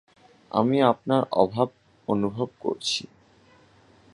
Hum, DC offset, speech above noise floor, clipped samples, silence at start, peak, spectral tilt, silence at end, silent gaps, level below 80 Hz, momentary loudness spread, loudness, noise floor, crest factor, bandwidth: none; under 0.1%; 33 dB; under 0.1%; 0.55 s; -4 dBFS; -5.5 dB/octave; 1.1 s; none; -64 dBFS; 9 LU; -25 LUFS; -57 dBFS; 22 dB; 11.5 kHz